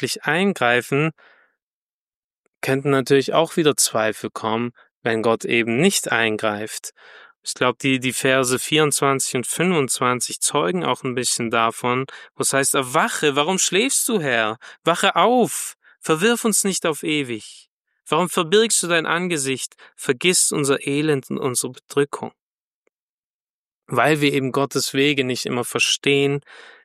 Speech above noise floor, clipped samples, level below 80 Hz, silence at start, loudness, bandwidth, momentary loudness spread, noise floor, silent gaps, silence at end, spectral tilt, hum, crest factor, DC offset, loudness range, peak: over 70 dB; under 0.1%; -68 dBFS; 0 s; -19 LUFS; 14.5 kHz; 9 LU; under -90 dBFS; 1.62-2.61 s, 4.91-5.02 s, 7.36-7.43 s, 17.68-17.85 s, 22.41-23.82 s; 0.15 s; -3 dB/octave; none; 20 dB; under 0.1%; 3 LU; -2 dBFS